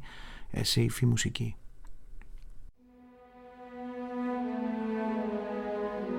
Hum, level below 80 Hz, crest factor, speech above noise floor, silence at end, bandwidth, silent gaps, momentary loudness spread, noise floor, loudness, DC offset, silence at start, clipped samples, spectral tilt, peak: none; -50 dBFS; 20 dB; 28 dB; 0 s; 16.5 kHz; none; 20 LU; -57 dBFS; -32 LUFS; under 0.1%; 0 s; under 0.1%; -5 dB/octave; -14 dBFS